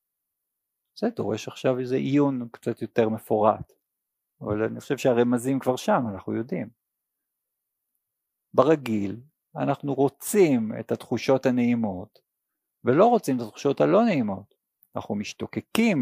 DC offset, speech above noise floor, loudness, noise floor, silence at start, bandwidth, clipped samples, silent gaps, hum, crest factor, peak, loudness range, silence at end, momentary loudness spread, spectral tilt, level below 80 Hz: under 0.1%; 59 dB; -25 LUFS; -83 dBFS; 0.95 s; 15.5 kHz; under 0.1%; none; none; 22 dB; -4 dBFS; 5 LU; 0 s; 12 LU; -6.5 dB/octave; -66 dBFS